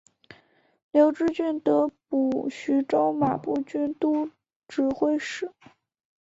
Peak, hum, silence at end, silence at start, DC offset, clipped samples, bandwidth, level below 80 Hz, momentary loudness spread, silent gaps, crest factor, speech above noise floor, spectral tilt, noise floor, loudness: -8 dBFS; none; 0.7 s; 0.95 s; under 0.1%; under 0.1%; 7.8 kHz; -66 dBFS; 9 LU; 4.56-4.62 s; 18 dB; 35 dB; -6.5 dB/octave; -60 dBFS; -25 LUFS